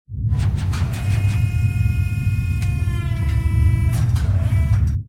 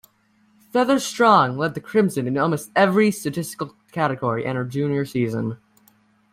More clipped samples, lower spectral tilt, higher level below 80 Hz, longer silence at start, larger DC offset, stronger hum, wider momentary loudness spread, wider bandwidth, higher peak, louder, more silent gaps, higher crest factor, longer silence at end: neither; first, -7 dB/octave vs -5.5 dB/octave; first, -24 dBFS vs -62 dBFS; second, 0.1 s vs 0.75 s; first, 0.3% vs under 0.1%; neither; second, 4 LU vs 12 LU; second, 14.5 kHz vs 16 kHz; second, -6 dBFS vs -2 dBFS; about the same, -20 LUFS vs -21 LUFS; neither; second, 12 dB vs 18 dB; second, 0 s vs 0.8 s